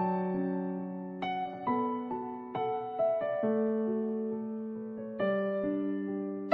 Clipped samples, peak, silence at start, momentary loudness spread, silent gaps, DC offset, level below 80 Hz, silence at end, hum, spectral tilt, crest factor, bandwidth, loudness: under 0.1%; -14 dBFS; 0 s; 8 LU; none; under 0.1%; -74 dBFS; 0 s; none; -10 dB/octave; 20 dB; 5.6 kHz; -33 LUFS